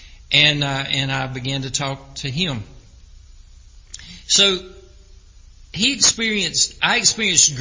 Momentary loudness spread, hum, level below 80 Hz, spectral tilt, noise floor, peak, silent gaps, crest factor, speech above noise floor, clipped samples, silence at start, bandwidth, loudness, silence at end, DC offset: 14 LU; none; -44 dBFS; -1.5 dB/octave; -45 dBFS; 0 dBFS; none; 20 dB; 26 dB; under 0.1%; 0 s; 8 kHz; -17 LUFS; 0 s; under 0.1%